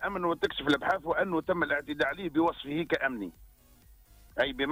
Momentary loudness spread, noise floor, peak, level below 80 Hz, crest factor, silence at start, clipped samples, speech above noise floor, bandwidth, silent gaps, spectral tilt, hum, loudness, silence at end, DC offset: 6 LU; -58 dBFS; -14 dBFS; -56 dBFS; 16 dB; 0 s; under 0.1%; 28 dB; 16 kHz; none; -5.5 dB/octave; none; -30 LUFS; 0 s; under 0.1%